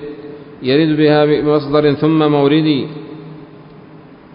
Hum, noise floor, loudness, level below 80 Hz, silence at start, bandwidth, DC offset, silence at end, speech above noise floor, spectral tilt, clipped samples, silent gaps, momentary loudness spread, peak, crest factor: none; -39 dBFS; -13 LUFS; -50 dBFS; 0 s; 5.4 kHz; under 0.1%; 0.4 s; 26 dB; -12.5 dB/octave; under 0.1%; none; 20 LU; 0 dBFS; 14 dB